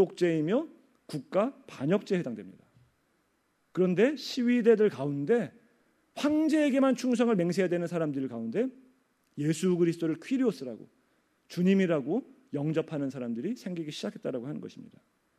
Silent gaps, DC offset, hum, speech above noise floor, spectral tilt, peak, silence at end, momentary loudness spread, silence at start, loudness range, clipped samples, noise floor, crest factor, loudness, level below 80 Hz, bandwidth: none; under 0.1%; none; 45 dB; -6.5 dB/octave; -10 dBFS; 0.55 s; 15 LU; 0 s; 6 LU; under 0.1%; -73 dBFS; 18 dB; -29 LUFS; -78 dBFS; 14 kHz